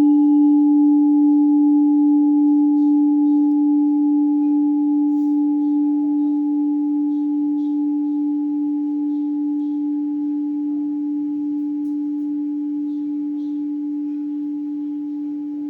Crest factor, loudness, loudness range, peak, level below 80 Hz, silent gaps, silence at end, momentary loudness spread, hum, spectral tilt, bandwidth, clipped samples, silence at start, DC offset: 8 dB; -19 LUFS; 9 LU; -10 dBFS; -78 dBFS; none; 0 s; 10 LU; none; -9.5 dB/octave; 0.9 kHz; under 0.1%; 0 s; under 0.1%